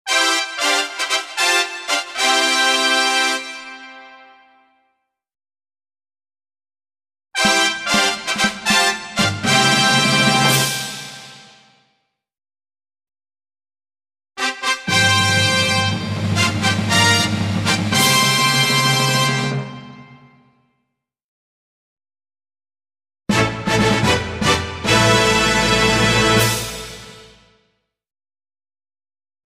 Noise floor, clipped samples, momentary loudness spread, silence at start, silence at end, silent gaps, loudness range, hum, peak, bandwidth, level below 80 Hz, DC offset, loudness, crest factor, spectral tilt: -75 dBFS; under 0.1%; 11 LU; 0.05 s; 2.3 s; 21.24-21.97 s; 10 LU; none; -2 dBFS; 16 kHz; -44 dBFS; under 0.1%; -15 LUFS; 18 dB; -3 dB/octave